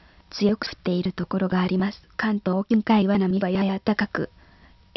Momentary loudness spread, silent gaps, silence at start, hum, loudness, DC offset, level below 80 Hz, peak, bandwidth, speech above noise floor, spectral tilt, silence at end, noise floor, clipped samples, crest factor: 8 LU; none; 0.35 s; none; -24 LUFS; under 0.1%; -54 dBFS; -8 dBFS; 6 kHz; 30 dB; -7.5 dB/octave; 0.7 s; -53 dBFS; under 0.1%; 16 dB